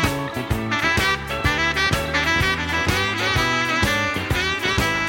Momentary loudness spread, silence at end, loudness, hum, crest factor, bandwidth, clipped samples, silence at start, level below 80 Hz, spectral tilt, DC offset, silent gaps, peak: 4 LU; 0 s; -20 LUFS; none; 18 dB; 17 kHz; under 0.1%; 0 s; -36 dBFS; -4 dB/octave; under 0.1%; none; -4 dBFS